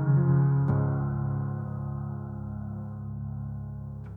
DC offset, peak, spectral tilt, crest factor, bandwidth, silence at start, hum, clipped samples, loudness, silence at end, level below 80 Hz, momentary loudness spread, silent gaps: under 0.1%; -14 dBFS; -13 dB/octave; 14 dB; 1.9 kHz; 0 s; none; under 0.1%; -30 LUFS; 0 s; -48 dBFS; 14 LU; none